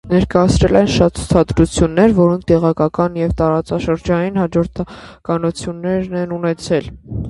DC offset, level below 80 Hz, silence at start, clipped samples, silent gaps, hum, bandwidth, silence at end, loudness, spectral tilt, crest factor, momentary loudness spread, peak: under 0.1%; -30 dBFS; 0.05 s; under 0.1%; none; none; 11.5 kHz; 0 s; -16 LUFS; -6.5 dB/octave; 16 dB; 9 LU; 0 dBFS